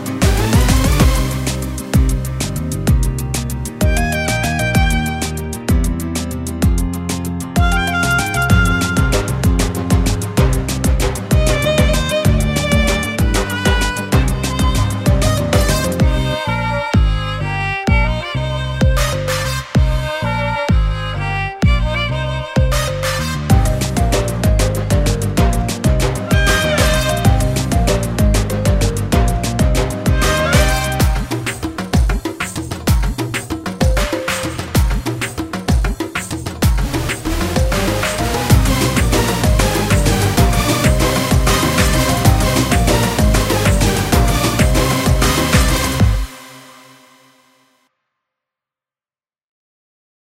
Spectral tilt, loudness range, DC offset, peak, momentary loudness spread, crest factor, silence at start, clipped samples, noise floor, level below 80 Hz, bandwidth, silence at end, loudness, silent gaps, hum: -5 dB/octave; 5 LU; under 0.1%; 0 dBFS; 7 LU; 16 dB; 0 s; under 0.1%; under -90 dBFS; -20 dBFS; 16.5 kHz; 3.65 s; -16 LUFS; none; none